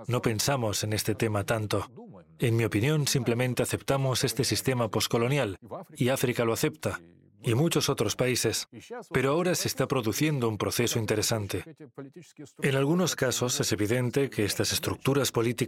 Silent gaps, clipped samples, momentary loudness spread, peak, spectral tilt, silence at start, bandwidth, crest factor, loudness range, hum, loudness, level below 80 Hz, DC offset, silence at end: none; under 0.1%; 9 LU; -12 dBFS; -4.5 dB/octave; 0 s; 17 kHz; 16 dB; 2 LU; none; -27 LUFS; -58 dBFS; under 0.1%; 0 s